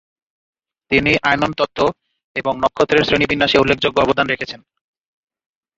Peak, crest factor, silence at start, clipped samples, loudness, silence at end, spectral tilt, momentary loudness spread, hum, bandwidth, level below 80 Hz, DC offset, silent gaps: 0 dBFS; 18 dB; 0.9 s; under 0.1%; -16 LUFS; 1.2 s; -5 dB/octave; 9 LU; none; 7.8 kHz; -44 dBFS; under 0.1%; 2.24-2.35 s